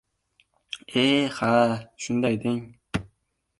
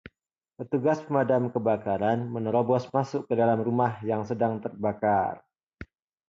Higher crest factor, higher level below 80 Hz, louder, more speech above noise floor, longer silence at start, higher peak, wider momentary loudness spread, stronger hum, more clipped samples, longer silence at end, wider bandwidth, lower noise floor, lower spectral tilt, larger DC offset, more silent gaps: about the same, 20 dB vs 18 dB; about the same, -56 dBFS vs -60 dBFS; about the same, -25 LUFS vs -27 LUFS; second, 50 dB vs 59 dB; first, 0.75 s vs 0.6 s; first, -6 dBFS vs -10 dBFS; first, 12 LU vs 6 LU; neither; neither; about the same, 0.55 s vs 0.45 s; first, 11.5 kHz vs 7.6 kHz; second, -73 dBFS vs -85 dBFS; second, -5 dB/octave vs -8.5 dB/octave; neither; second, none vs 5.63-5.67 s